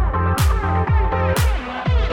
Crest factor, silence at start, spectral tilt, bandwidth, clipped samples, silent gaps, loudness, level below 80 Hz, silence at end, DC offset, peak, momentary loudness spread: 10 dB; 0 s; -6 dB/octave; 17 kHz; under 0.1%; none; -19 LUFS; -20 dBFS; 0 s; under 0.1%; -6 dBFS; 3 LU